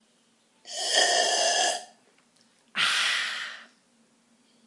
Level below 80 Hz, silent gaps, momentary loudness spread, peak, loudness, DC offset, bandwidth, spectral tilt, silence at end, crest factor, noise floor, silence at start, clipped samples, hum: under -90 dBFS; none; 15 LU; -8 dBFS; -24 LUFS; under 0.1%; 12 kHz; 2 dB/octave; 1.05 s; 20 dB; -65 dBFS; 0.65 s; under 0.1%; none